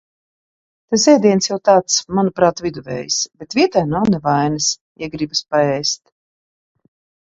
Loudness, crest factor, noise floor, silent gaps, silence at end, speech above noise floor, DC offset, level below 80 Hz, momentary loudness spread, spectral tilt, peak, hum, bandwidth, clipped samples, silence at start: -17 LUFS; 18 dB; under -90 dBFS; 4.81-4.95 s; 1.35 s; over 74 dB; under 0.1%; -52 dBFS; 12 LU; -4 dB/octave; 0 dBFS; none; 7.8 kHz; under 0.1%; 0.9 s